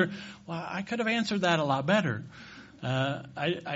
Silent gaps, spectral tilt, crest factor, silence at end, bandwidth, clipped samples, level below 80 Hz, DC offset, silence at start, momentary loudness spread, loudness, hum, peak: none; -4 dB/octave; 20 dB; 0 s; 8 kHz; under 0.1%; -66 dBFS; under 0.1%; 0 s; 15 LU; -30 LUFS; none; -10 dBFS